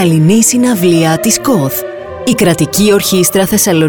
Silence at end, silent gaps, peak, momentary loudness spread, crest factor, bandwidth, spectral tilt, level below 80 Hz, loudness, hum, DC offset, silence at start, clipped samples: 0 s; none; 0 dBFS; 8 LU; 10 dB; over 20 kHz; -4.5 dB/octave; -42 dBFS; -10 LUFS; none; 0.4%; 0 s; under 0.1%